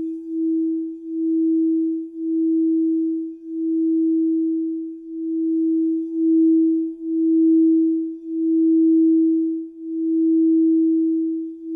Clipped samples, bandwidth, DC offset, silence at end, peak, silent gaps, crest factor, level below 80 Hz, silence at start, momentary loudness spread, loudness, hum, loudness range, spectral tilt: under 0.1%; 0.4 kHz; under 0.1%; 0 s; -12 dBFS; none; 8 dB; -72 dBFS; 0 s; 11 LU; -20 LUFS; none; 4 LU; -11.5 dB/octave